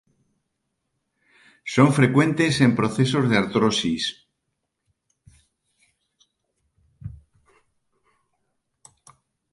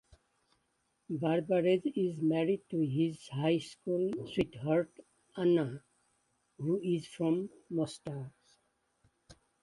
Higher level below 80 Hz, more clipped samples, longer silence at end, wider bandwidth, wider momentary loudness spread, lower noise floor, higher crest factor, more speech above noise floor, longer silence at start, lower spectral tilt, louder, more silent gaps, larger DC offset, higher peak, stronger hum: first, -56 dBFS vs -68 dBFS; neither; first, 2.4 s vs 0.3 s; about the same, 11.5 kHz vs 11.5 kHz; first, 23 LU vs 12 LU; about the same, -78 dBFS vs -78 dBFS; about the same, 22 dB vs 18 dB; first, 59 dB vs 46 dB; first, 1.65 s vs 1.1 s; second, -5.5 dB/octave vs -7.5 dB/octave; first, -20 LUFS vs -33 LUFS; neither; neither; first, -2 dBFS vs -16 dBFS; neither